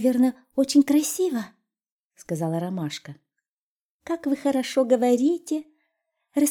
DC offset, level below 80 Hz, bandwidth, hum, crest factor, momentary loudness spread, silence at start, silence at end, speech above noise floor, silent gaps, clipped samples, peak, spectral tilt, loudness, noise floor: under 0.1%; -70 dBFS; 19 kHz; none; 18 dB; 12 LU; 0 s; 0 s; over 67 dB; 1.91-2.10 s, 3.51-3.99 s; under 0.1%; -8 dBFS; -5 dB/octave; -24 LUFS; under -90 dBFS